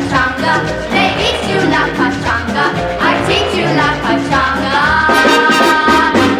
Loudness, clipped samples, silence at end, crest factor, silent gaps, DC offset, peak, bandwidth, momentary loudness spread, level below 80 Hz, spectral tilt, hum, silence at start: -12 LUFS; under 0.1%; 0 s; 12 dB; none; under 0.1%; 0 dBFS; 18 kHz; 6 LU; -32 dBFS; -4.5 dB/octave; none; 0 s